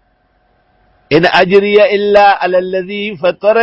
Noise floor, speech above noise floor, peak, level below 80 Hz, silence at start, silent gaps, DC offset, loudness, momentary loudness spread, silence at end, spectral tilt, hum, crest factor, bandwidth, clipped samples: -56 dBFS; 46 dB; 0 dBFS; -48 dBFS; 1.1 s; none; under 0.1%; -10 LUFS; 9 LU; 0 s; -6.5 dB/octave; none; 12 dB; 8 kHz; 0.5%